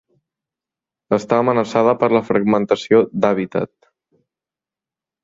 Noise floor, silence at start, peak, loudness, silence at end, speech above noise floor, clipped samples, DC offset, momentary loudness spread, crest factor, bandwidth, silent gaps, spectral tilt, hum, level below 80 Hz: -89 dBFS; 1.1 s; -2 dBFS; -17 LUFS; 1.55 s; 73 dB; under 0.1%; under 0.1%; 7 LU; 18 dB; 7.8 kHz; none; -7 dB/octave; none; -60 dBFS